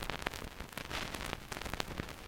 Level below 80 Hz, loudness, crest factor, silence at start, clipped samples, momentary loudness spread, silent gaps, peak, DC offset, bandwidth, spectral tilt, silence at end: -50 dBFS; -41 LUFS; 32 dB; 0 s; under 0.1%; 6 LU; none; -10 dBFS; under 0.1%; 17 kHz; -3.5 dB/octave; 0 s